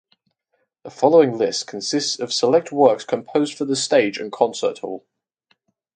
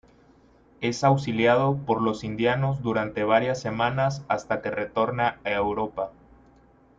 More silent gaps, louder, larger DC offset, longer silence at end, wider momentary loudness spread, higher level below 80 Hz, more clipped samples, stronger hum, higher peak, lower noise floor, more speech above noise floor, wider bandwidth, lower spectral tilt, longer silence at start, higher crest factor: neither; first, -19 LUFS vs -25 LUFS; neither; about the same, 1 s vs 0.9 s; first, 10 LU vs 7 LU; second, -70 dBFS vs -56 dBFS; neither; neither; first, 0 dBFS vs -6 dBFS; first, -71 dBFS vs -57 dBFS; first, 52 dB vs 32 dB; first, 9.4 kHz vs 7.6 kHz; second, -3.5 dB/octave vs -6.5 dB/octave; about the same, 0.85 s vs 0.8 s; about the same, 20 dB vs 18 dB